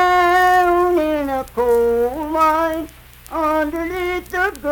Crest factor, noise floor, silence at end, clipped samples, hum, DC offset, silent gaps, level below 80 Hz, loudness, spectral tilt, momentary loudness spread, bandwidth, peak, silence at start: 12 dB; -38 dBFS; 0 s; under 0.1%; none; under 0.1%; none; -40 dBFS; -17 LUFS; -4.5 dB/octave; 9 LU; 19 kHz; -4 dBFS; 0 s